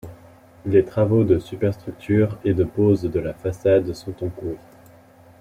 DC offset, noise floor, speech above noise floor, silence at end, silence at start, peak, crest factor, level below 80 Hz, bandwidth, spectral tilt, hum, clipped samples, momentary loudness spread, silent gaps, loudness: under 0.1%; -49 dBFS; 29 dB; 0.85 s; 0.05 s; -4 dBFS; 18 dB; -48 dBFS; 15 kHz; -9 dB/octave; none; under 0.1%; 14 LU; none; -21 LUFS